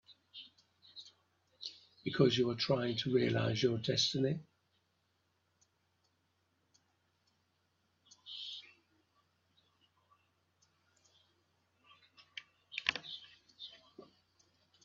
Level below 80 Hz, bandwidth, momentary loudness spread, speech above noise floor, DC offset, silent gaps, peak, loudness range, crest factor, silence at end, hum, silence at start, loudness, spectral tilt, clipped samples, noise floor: -76 dBFS; 7.4 kHz; 21 LU; 46 dB; under 0.1%; none; -10 dBFS; 19 LU; 32 dB; 0.85 s; none; 0.1 s; -35 LUFS; -4 dB/octave; under 0.1%; -79 dBFS